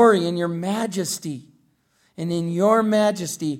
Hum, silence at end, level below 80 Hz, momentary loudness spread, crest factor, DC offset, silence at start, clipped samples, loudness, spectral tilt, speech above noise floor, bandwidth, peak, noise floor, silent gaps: none; 0 s; -68 dBFS; 13 LU; 18 dB; under 0.1%; 0 s; under 0.1%; -22 LUFS; -5 dB/octave; 42 dB; 16.5 kHz; -4 dBFS; -64 dBFS; none